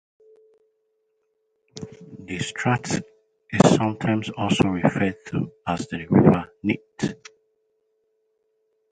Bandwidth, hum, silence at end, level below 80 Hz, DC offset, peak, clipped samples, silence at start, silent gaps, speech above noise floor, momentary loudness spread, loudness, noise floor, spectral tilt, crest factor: 9.4 kHz; none; 1.75 s; -52 dBFS; under 0.1%; 0 dBFS; under 0.1%; 1.75 s; none; 50 dB; 20 LU; -23 LUFS; -72 dBFS; -6 dB/octave; 24 dB